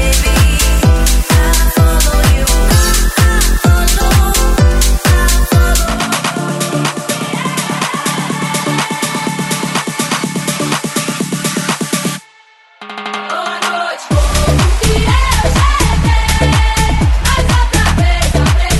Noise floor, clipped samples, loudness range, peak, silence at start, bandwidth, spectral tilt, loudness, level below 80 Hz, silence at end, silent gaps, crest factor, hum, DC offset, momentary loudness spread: -45 dBFS; under 0.1%; 6 LU; 0 dBFS; 0 s; 16.5 kHz; -4 dB/octave; -13 LUFS; -14 dBFS; 0 s; none; 12 dB; none; under 0.1%; 6 LU